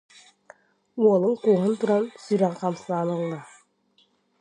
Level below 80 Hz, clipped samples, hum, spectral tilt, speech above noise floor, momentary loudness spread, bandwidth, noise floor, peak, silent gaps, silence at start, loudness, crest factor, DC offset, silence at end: -76 dBFS; under 0.1%; none; -7.5 dB/octave; 42 dB; 10 LU; 10 kHz; -65 dBFS; -8 dBFS; none; 0.95 s; -24 LUFS; 18 dB; under 0.1%; 0.95 s